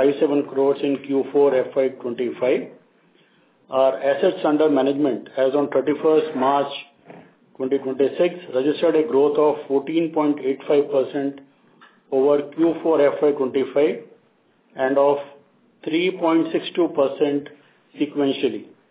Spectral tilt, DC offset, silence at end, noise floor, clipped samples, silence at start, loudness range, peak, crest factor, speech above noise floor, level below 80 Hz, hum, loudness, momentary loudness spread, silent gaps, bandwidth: -10 dB/octave; under 0.1%; 0.25 s; -60 dBFS; under 0.1%; 0 s; 2 LU; -6 dBFS; 16 dB; 41 dB; -76 dBFS; none; -21 LUFS; 8 LU; none; 4 kHz